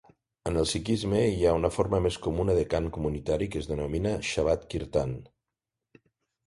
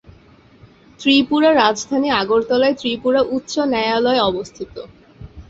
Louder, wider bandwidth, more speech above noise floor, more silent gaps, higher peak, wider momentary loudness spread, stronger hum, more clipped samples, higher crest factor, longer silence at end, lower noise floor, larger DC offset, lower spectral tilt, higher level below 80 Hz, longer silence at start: second, -28 LUFS vs -17 LUFS; first, 11.5 kHz vs 8 kHz; first, 60 dB vs 31 dB; neither; second, -10 dBFS vs -2 dBFS; second, 7 LU vs 13 LU; neither; neither; about the same, 20 dB vs 16 dB; first, 1.2 s vs 0.05 s; first, -88 dBFS vs -48 dBFS; neither; first, -6 dB/octave vs -4 dB/octave; first, -42 dBFS vs -48 dBFS; second, 0.45 s vs 1 s